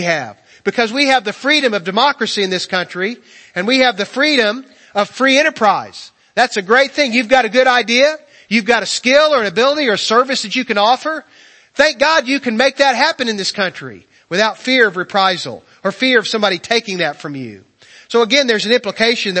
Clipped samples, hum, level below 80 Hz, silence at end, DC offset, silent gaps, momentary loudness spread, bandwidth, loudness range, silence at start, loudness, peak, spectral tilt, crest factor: under 0.1%; none; -58 dBFS; 0 s; under 0.1%; none; 11 LU; 8.8 kHz; 3 LU; 0 s; -14 LUFS; 0 dBFS; -3 dB/octave; 16 dB